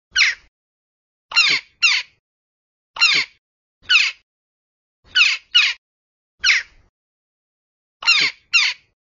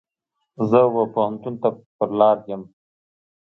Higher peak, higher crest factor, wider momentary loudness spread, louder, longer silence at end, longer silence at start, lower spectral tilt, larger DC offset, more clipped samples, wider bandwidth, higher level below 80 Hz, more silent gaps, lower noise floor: about the same, -2 dBFS vs -4 dBFS; about the same, 20 dB vs 18 dB; second, 6 LU vs 11 LU; first, -16 LUFS vs -20 LUFS; second, 0.35 s vs 0.95 s; second, 0.15 s vs 0.6 s; second, 2.5 dB/octave vs -9.5 dB/octave; neither; neither; first, 7.8 kHz vs 5.8 kHz; first, -62 dBFS vs -68 dBFS; first, 0.48-1.29 s, 2.19-2.94 s, 3.38-3.81 s, 4.23-5.03 s, 5.78-6.38 s, 6.89-8.00 s vs 1.86-1.99 s; first, under -90 dBFS vs -78 dBFS